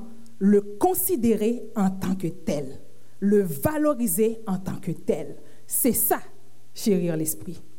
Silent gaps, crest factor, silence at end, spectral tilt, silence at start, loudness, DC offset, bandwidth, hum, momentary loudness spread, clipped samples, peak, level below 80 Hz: none; 18 dB; 0.2 s; -5.5 dB/octave; 0 s; -24 LUFS; 2%; 17 kHz; none; 9 LU; under 0.1%; -8 dBFS; -58 dBFS